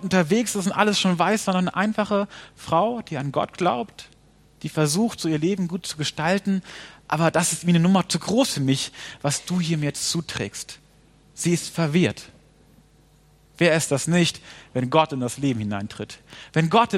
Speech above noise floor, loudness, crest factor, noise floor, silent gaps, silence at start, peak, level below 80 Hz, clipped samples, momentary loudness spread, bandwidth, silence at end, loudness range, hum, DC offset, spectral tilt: 33 dB; -23 LUFS; 20 dB; -56 dBFS; none; 0 s; -2 dBFS; -58 dBFS; under 0.1%; 11 LU; 15.5 kHz; 0 s; 4 LU; none; under 0.1%; -4.5 dB/octave